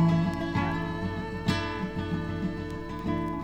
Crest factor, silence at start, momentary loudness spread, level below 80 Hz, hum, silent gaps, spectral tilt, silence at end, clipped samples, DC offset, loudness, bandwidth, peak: 16 dB; 0 s; 5 LU; -46 dBFS; none; none; -7 dB/octave; 0 s; under 0.1%; under 0.1%; -31 LUFS; 9.6 kHz; -14 dBFS